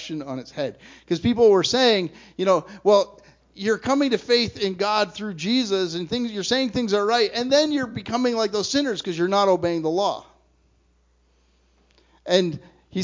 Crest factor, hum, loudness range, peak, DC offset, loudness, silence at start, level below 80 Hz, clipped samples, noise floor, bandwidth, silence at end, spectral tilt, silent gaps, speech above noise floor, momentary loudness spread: 18 dB; none; 5 LU; -4 dBFS; under 0.1%; -22 LUFS; 0 s; -56 dBFS; under 0.1%; -62 dBFS; 7.6 kHz; 0 s; -4.5 dB/octave; none; 40 dB; 12 LU